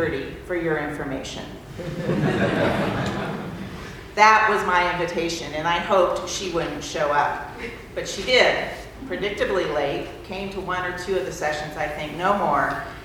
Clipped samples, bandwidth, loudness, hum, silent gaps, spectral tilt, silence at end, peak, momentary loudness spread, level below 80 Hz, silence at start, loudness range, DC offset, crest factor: under 0.1%; 19.5 kHz; -23 LUFS; none; none; -4.5 dB/octave; 0 s; 0 dBFS; 15 LU; -46 dBFS; 0 s; 5 LU; under 0.1%; 24 dB